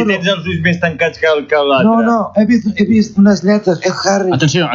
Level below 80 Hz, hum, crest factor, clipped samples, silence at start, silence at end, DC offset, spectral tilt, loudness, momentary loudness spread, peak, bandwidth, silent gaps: -44 dBFS; none; 10 dB; under 0.1%; 0 s; 0 s; under 0.1%; -5.5 dB/octave; -12 LUFS; 4 LU; -2 dBFS; 7.6 kHz; none